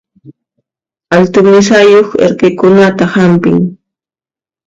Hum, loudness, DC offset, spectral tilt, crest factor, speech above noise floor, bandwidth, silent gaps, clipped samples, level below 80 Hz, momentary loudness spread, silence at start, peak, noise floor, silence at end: none; -7 LUFS; under 0.1%; -6 dB/octave; 8 dB; over 84 dB; 7.8 kHz; none; 0.3%; -48 dBFS; 6 LU; 0.25 s; 0 dBFS; under -90 dBFS; 0.9 s